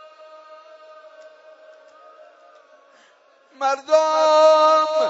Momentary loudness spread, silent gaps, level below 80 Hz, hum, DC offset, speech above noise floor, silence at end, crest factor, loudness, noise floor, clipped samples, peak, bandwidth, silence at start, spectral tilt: 10 LU; none; under -90 dBFS; none; under 0.1%; 39 dB; 0 s; 18 dB; -16 LUFS; -55 dBFS; under 0.1%; -4 dBFS; 8 kHz; 3.6 s; -0.5 dB/octave